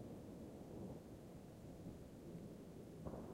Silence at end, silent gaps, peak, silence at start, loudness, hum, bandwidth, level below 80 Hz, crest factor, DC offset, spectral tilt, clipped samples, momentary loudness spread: 0 s; none; -36 dBFS; 0 s; -55 LUFS; none; 16 kHz; -68 dBFS; 18 dB; under 0.1%; -7.5 dB/octave; under 0.1%; 4 LU